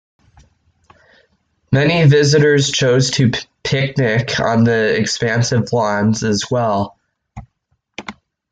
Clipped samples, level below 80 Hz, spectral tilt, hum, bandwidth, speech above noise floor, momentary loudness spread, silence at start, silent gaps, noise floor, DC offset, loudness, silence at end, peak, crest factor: under 0.1%; -48 dBFS; -5 dB/octave; none; 9.2 kHz; 53 dB; 12 LU; 1.7 s; none; -67 dBFS; under 0.1%; -15 LUFS; 0.4 s; -2 dBFS; 14 dB